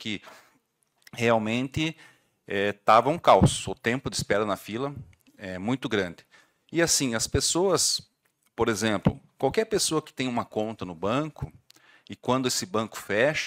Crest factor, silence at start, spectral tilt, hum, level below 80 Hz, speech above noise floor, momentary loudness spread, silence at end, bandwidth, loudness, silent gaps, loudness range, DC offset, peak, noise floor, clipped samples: 22 dB; 0 s; -4 dB/octave; none; -52 dBFS; 44 dB; 14 LU; 0 s; 16 kHz; -26 LUFS; none; 5 LU; under 0.1%; -6 dBFS; -70 dBFS; under 0.1%